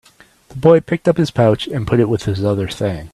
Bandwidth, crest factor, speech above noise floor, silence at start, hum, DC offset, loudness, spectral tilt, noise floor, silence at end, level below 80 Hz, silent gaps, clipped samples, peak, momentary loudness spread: 13 kHz; 16 dB; 31 dB; 0.5 s; none; under 0.1%; -16 LUFS; -7.5 dB/octave; -46 dBFS; 0.05 s; -42 dBFS; none; under 0.1%; 0 dBFS; 8 LU